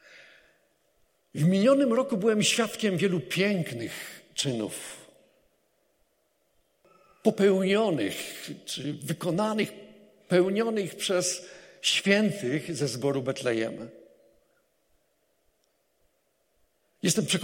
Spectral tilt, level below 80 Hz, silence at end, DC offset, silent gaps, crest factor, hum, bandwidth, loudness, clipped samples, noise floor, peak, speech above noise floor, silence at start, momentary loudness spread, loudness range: -4.5 dB/octave; -74 dBFS; 0 s; under 0.1%; none; 22 dB; none; 16.5 kHz; -27 LUFS; under 0.1%; -73 dBFS; -8 dBFS; 46 dB; 0.15 s; 13 LU; 10 LU